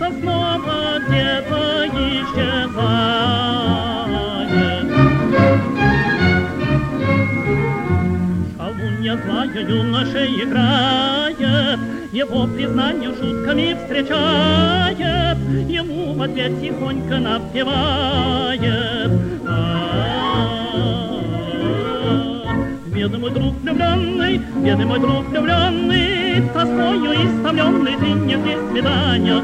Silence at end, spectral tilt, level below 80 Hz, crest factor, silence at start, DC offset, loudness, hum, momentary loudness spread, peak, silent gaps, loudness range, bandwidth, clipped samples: 0 s; -7 dB/octave; -36 dBFS; 16 dB; 0 s; under 0.1%; -18 LUFS; none; 6 LU; 0 dBFS; none; 4 LU; 12 kHz; under 0.1%